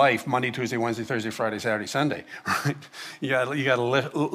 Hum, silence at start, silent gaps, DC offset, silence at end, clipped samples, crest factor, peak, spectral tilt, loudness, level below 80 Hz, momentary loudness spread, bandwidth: none; 0 s; none; under 0.1%; 0 s; under 0.1%; 20 dB; -6 dBFS; -5 dB/octave; -26 LUFS; -68 dBFS; 8 LU; 15 kHz